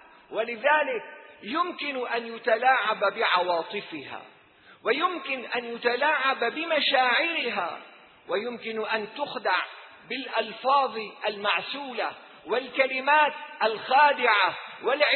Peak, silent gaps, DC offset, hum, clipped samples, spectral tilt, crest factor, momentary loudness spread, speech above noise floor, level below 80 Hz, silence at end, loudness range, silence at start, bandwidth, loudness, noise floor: -6 dBFS; none; under 0.1%; none; under 0.1%; -5.5 dB/octave; 20 dB; 13 LU; 29 dB; -80 dBFS; 0 s; 5 LU; 0.3 s; 4.5 kHz; -26 LUFS; -55 dBFS